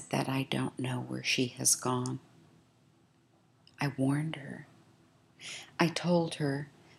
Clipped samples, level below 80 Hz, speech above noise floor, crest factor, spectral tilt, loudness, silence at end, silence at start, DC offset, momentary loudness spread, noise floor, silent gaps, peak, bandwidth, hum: under 0.1%; -76 dBFS; 34 dB; 26 dB; -4 dB/octave; -32 LUFS; 0.3 s; 0 s; under 0.1%; 16 LU; -67 dBFS; none; -10 dBFS; 15.5 kHz; none